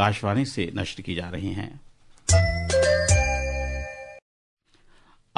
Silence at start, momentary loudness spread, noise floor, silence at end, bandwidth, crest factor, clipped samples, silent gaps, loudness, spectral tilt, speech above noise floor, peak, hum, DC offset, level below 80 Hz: 0 s; 15 LU; -56 dBFS; 1.2 s; 11 kHz; 20 dB; under 0.1%; none; -24 LUFS; -4.5 dB/octave; 29 dB; -6 dBFS; none; under 0.1%; -36 dBFS